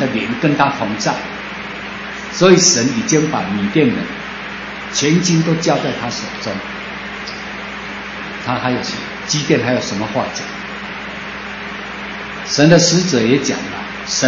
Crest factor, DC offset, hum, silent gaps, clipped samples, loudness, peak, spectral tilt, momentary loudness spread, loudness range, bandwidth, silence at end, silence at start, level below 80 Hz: 18 dB; under 0.1%; none; none; under 0.1%; -17 LUFS; 0 dBFS; -4 dB/octave; 15 LU; 7 LU; 8 kHz; 0 s; 0 s; -46 dBFS